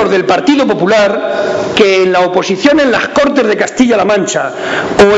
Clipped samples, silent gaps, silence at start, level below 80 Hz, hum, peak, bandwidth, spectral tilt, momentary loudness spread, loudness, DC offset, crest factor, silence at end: 0.1%; none; 0 s; -42 dBFS; none; 0 dBFS; 9.2 kHz; -4.5 dB/octave; 6 LU; -10 LUFS; under 0.1%; 10 dB; 0 s